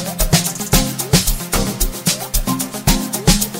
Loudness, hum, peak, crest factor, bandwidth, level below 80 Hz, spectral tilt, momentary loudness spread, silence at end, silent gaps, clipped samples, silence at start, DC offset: -17 LUFS; none; 0 dBFS; 16 dB; 16.5 kHz; -24 dBFS; -3.5 dB/octave; 4 LU; 0 s; none; under 0.1%; 0 s; under 0.1%